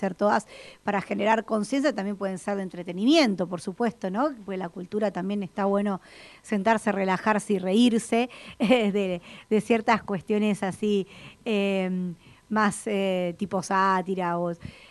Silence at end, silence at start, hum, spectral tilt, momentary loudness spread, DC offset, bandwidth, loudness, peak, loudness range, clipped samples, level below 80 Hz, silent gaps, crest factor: 0.2 s; 0 s; none; -5.5 dB/octave; 11 LU; under 0.1%; 12 kHz; -26 LUFS; -6 dBFS; 3 LU; under 0.1%; -64 dBFS; none; 20 dB